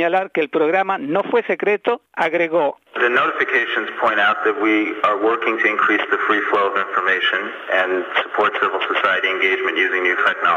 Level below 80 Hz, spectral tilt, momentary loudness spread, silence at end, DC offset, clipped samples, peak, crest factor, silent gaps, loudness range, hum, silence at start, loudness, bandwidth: -70 dBFS; -4.5 dB/octave; 4 LU; 0 s; under 0.1%; under 0.1%; -4 dBFS; 14 dB; none; 1 LU; none; 0 s; -18 LUFS; 15 kHz